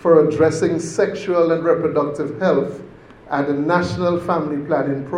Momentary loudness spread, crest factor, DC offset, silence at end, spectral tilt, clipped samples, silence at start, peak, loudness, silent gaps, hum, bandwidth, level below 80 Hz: 6 LU; 16 dB; under 0.1%; 0 s; -6.5 dB/octave; under 0.1%; 0 s; -2 dBFS; -19 LUFS; none; none; 11 kHz; -54 dBFS